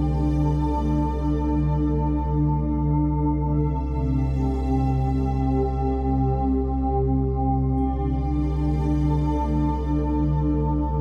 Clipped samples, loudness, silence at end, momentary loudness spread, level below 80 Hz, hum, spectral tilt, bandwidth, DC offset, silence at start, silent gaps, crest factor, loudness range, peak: under 0.1%; -23 LUFS; 0 s; 2 LU; -26 dBFS; none; -10.5 dB/octave; 5.6 kHz; under 0.1%; 0 s; none; 10 dB; 0 LU; -10 dBFS